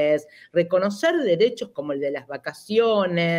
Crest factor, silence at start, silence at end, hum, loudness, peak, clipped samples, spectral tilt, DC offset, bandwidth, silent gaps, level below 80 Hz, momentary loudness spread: 14 dB; 0 s; 0 s; none; -23 LUFS; -8 dBFS; under 0.1%; -6 dB/octave; under 0.1%; 15 kHz; none; -72 dBFS; 11 LU